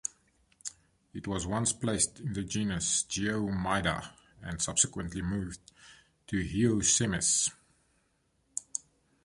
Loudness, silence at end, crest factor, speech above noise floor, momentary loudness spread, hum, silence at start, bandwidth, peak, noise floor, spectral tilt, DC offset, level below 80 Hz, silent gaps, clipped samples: -30 LUFS; 0.45 s; 24 dB; 42 dB; 17 LU; none; 0.05 s; 11.5 kHz; -10 dBFS; -73 dBFS; -3 dB/octave; under 0.1%; -52 dBFS; none; under 0.1%